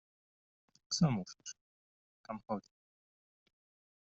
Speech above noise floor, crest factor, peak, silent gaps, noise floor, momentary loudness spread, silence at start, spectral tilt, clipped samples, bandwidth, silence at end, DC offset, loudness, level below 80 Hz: over 53 dB; 22 dB; -20 dBFS; 1.61-2.24 s; under -90 dBFS; 17 LU; 0.9 s; -6 dB/octave; under 0.1%; 7.6 kHz; 1.55 s; under 0.1%; -37 LUFS; -72 dBFS